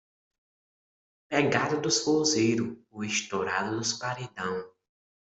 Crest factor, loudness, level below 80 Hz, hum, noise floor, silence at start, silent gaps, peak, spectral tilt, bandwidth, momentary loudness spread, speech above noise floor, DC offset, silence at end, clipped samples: 20 dB; -28 LUFS; -68 dBFS; none; under -90 dBFS; 1.3 s; none; -10 dBFS; -3.5 dB/octave; 8.2 kHz; 10 LU; over 62 dB; under 0.1%; 0.6 s; under 0.1%